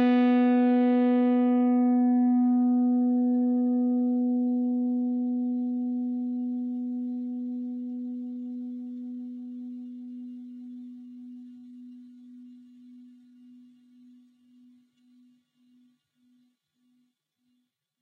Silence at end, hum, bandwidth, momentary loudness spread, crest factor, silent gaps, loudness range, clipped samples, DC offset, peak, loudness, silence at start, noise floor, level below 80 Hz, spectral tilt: 4.95 s; none; 3.9 kHz; 21 LU; 14 dB; none; 22 LU; under 0.1%; under 0.1%; -14 dBFS; -26 LUFS; 0 s; -76 dBFS; under -90 dBFS; -8.5 dB/octave